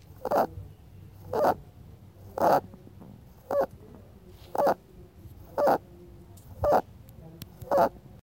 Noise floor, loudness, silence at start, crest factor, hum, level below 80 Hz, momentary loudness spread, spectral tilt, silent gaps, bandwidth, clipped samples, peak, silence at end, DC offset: -51 dBFS; -28 LUFS; 0.1 s; 20 dB; none; -52 dBFS; 24 LU; -6.5 dB/octave; none; 17 kHz; under 0.1%; -10 dBFS; 0.25 s; under 0.1%